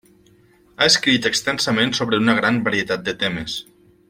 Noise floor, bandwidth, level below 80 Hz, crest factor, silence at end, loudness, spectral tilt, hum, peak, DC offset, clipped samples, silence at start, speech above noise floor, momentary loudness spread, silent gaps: -54 dBFS; 16.5 kHz; -54 dBFS; 20 dB; 0.45 s; -18 LUFS; -3 dB/octave; none; -2 dBFS; under 0.1%; under 0.1%; 0.8 s; 34 dB; 9 LU; none